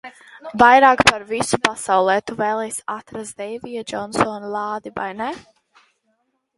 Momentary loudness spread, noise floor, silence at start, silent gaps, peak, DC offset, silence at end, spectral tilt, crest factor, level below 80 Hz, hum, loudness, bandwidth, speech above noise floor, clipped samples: 18 LU; -69 dBFS; 0.05 s; none; 0 dBFS; under 0.1%; 1.15 s; -3 dB/octave; 20 dB; -52 dBFS; none; -18 LUFS; 12 kHz; 50 dB; under 0.1%